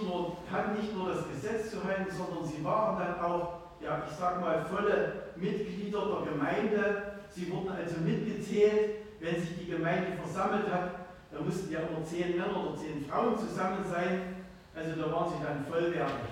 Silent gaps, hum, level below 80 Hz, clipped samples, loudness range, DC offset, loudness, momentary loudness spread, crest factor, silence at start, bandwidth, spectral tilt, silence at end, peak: none; none; -60 dBFS; under 0.1%; 2 LU; under 0.1%; -33 LUFS; 7 LU; 18 dB; 0 s; 16 kHz; -6.5 dB/octave; 0 s; -14 dBFS